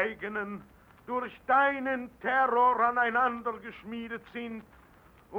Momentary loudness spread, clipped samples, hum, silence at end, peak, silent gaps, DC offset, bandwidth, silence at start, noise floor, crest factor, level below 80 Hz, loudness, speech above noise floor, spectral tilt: 16 LU; under 0.1%; none; 0 s; -14 dBFS; none; under 0.1%; 16.5 kHz; 0 s; -58 dBFS; 18 dB; -64 dBFS; -29 LUFS; 28 dB; -6 dB/octave